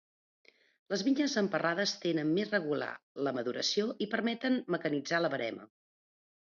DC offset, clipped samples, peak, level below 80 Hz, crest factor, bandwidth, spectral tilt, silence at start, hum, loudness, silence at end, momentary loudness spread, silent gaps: under 0.1%; under 0.1%; -16 dBFS; -82 dBFS; 18 dB; 7.4 kHz; -4.5 dB/octave; 0.9 s; none; -32 LUFS; 0.85 s; 7 LU; 3.03-3.15 s